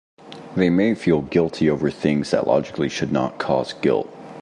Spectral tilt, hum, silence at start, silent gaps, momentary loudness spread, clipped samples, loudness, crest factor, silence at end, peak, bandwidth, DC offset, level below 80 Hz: -6.5 dB/octave; none; 0.25 s; none; 6 LU; under 0.1%; -21 LUFS; 16 dB; 0 s; -4 dBFS; 11 kHz; under 0.1%; -50 dBFS